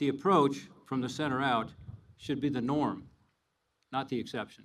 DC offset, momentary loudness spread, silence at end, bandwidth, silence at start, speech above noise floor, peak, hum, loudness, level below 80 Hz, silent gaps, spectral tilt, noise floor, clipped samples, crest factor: under 0.1%; 17 LU; 0.1 s; 12.5 kHz; 0 s; 48 dB; -12 dBFS; none; -32 LUFS; -64 dBFS; none; -6 dB/octave; -79 dBFS; under 0.1%; 20 dB